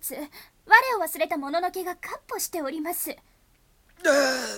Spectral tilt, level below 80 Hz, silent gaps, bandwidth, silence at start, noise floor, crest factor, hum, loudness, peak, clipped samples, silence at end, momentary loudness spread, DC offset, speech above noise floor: -1 dB/octave; -64 dBFS; none; 18 kHz; 0 s; -62 dBFS; 24 dB; none; -24 LUFS; -2 dBFS; under 0.1%; 0 s; 17 LU; under 0.1%; 34 dB